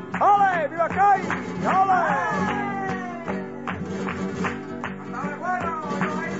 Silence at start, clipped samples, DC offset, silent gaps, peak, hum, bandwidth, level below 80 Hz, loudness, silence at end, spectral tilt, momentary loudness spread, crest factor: 0 s; under 0.1%; 0.2%; none; -10 dBFS; none; 8 kHz; -58 dBFS; -24 LUFS; 0 s; -6 dB/octave; 12 LU; 14 dB